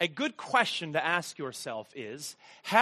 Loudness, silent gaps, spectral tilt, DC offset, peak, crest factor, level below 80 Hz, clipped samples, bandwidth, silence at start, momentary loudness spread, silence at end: -31 LUFS; none; -3 dB/octave; under 0.1%; -8 dBFS; 24 dB; -80 dBFS; under 0.1%; 13 kHz; 0 s; 14 LU; 0 s